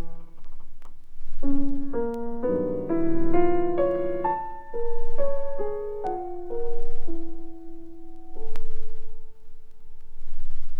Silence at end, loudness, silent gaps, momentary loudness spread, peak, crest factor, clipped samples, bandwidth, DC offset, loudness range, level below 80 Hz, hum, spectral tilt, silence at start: 0 s; -29 LUFS; none; 21 LU; -6 dBFS; 12 dB; under 0.1%; 2.3 kHz; under 0.1%; 16 LU; -30 dBFS; none; -9.5 dB/octave; 0 s